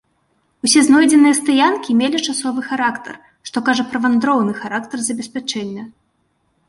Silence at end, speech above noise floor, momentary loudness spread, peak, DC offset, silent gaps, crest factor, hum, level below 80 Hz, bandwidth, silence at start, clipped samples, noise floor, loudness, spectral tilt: 0.8 s; 49 dB; 15 LU; -2 dBFS; under 0.1%; none; 16 dB; none; -62 dBFS; 11.5 kHz; 0.65 s; under 0.1%; -65 dBFS; -16 LUFS; -3 dB/octave